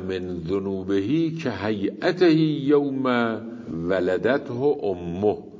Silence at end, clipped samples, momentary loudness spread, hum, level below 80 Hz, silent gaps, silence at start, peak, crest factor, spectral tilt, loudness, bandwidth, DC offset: 0 s; under 0.1%; 8 LU; none; -52 dBFS; none; 0 s; -8 dBFS; 16 dB; -7.5 dB/octave; -23 LUFS; 7.6 kHz; under 0.1%